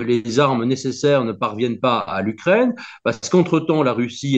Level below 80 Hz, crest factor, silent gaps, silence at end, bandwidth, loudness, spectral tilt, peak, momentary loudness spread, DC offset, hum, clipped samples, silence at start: -60 dBFS; 16 dB; none; 0 s; 8.4 kHz; -19 LUFS; -6 dB/octave; -2 dBFS; 6 LU; under 0.1%; none; under 0.1%; 0 s